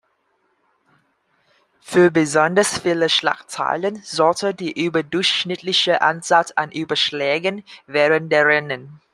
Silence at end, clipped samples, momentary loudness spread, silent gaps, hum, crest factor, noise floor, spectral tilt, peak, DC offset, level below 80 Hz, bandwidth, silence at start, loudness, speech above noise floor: 0.2 s; under 0.1%; 8 LU; none; none; 18 dB; -66 dBFS; -3.5 dB/octave; -2 dBFS; under 0.1%; -64 dBFS; 13 kHz; 1.85 s; -18 LUFS; 47 dB